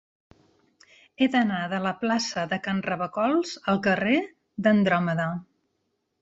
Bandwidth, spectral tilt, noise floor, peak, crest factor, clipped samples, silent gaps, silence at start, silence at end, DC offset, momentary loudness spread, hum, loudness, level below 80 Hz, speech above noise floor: 8 kHz; -5.5 dB/octave; -76 dBFS; -8 dBFS; 18 dB; under 0.1%; none; 1.2 s; 0.8 s; under 0.1%; 7 LU; none; -25 LUFS; -64 dBFS; 51 dB